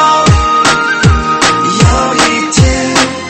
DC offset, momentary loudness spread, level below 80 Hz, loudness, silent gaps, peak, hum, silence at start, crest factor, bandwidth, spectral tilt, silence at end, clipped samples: under 0.1%; 2 LU; -20 dBFS; -9 LUFS; none; 0 dBFS; none; 0 s; 8 dB; 12 kHz; -4 dB/octave; 0 s; 0.4%